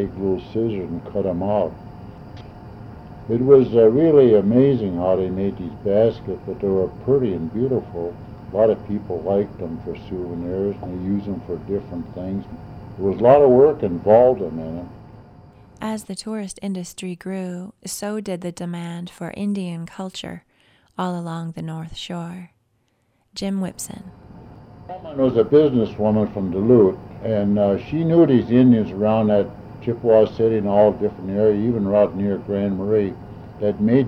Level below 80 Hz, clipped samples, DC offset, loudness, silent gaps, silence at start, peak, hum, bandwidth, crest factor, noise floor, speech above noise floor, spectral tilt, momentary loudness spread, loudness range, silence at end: -48 dBFS; under 0.1%; under 0.1%; -20 LUFS; none; 0 s; -2 dBFS; none; 14.5 kHz; 18 dB; -66 dBFS; 47 dB; -7.5 dB/octave; 18 LU; 12 LU; 0 s